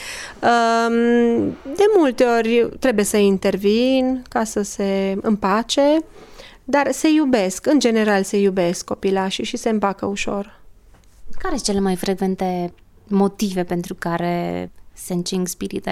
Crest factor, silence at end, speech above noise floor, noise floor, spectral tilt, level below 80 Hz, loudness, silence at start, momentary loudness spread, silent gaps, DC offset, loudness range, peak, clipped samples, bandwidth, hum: 16 dB; 0 s; 29 dB; -47 dBFS; -5 dB/octave; -44 dBFS; -19 LUFS; 0 s; 10 LU; none; under 0.1%; 6 LU; -2 dBFS; under 0.1%; 15 kHz; none